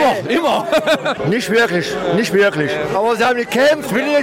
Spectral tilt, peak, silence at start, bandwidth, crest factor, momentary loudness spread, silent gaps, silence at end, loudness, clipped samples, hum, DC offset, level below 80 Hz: -4.5 dB/octave; -4 dBFS; 0 s; 16.5 kHz; 12 dB; 4 LU; none; 0 s; -15 LUFS; under 0.1%; none; under 0.1%; -52 dBFS